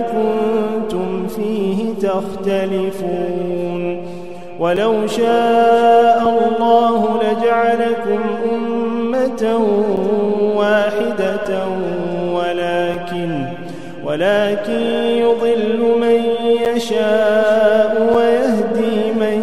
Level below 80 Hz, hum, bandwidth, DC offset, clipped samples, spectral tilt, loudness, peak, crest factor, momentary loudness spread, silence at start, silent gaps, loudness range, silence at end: -54 dBFS; none; 13 kHz; 2%; under 0.1%; -6 dB/octave; -16 LUFS; 0 dBFS; 16 dB; 8 LU; 0 s; none; 6 LU; 0 s